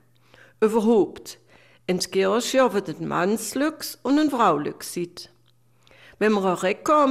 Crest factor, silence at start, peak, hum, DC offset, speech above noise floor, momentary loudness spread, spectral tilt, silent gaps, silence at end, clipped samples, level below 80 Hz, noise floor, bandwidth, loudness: 16 dB; 0.6 s; -8 dBFS; none; under 0.1%; 40 dB; 12 LU; -4.5 dB/octave; none; 0 s; under 0.1%; -64 dBFS; -62 dBFS; 15.5 kHz; -23 LUFS